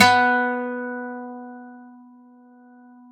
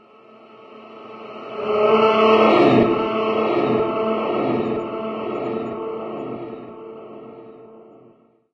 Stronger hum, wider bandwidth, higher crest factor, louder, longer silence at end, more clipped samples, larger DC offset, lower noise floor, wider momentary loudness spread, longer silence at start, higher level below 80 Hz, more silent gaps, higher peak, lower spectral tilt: neither; first, 13 kHz vs 6.4 kHz; about the same, 22 dB vs 20 dB; second, -22 LUFS vs -19 LUFS; first, 1.2 s vs 0.7 s; neither; neither; second, -49 dBFS vs -53 dBFS; about the same, 25 LU vs 24 LU; second, 0 s vs 0.7 s; second, -68 dBFS vs -58 dBFS; neither; about the same, 0 dBFS vs -2 dBFS; second, -3 dB/octave vs -7.5 dB/octave